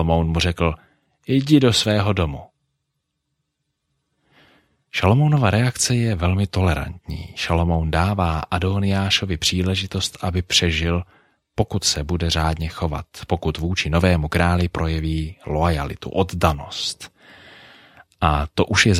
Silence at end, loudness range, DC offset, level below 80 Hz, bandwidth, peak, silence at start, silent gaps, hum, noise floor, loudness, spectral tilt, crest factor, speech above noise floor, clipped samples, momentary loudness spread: 0 s; 4 LU; under 0.1%; -34 dBFS; 14.5 kHz; -2 dBFS; 0 s; none; none; -76 dBFS; -20 LUFS; -5 dB/octave; 20 dB; 56 dB; under 0.1%; 10 LU